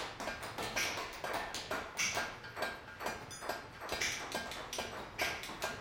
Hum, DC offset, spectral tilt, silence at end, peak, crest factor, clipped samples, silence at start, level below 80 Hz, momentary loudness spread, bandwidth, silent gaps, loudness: none; under 0.1%; -1.5 dB/octave; 0 s; -20 dBFS; 22 dB; under 0.1%; 0 s; -62 dBFS; 7 LU; 17 kHz; none; -39 LUFS